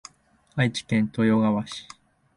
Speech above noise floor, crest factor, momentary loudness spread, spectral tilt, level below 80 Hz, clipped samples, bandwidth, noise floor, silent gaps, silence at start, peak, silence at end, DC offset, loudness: 37 dB; 18 dB; 14 LU; -6 dB/octave; -60 dBFS; under 0.1%; 11 kHz; -60 dBFS; none; 0.55 s; -8 dBFS; 0.55 s; under 0.1%; -24 LUFS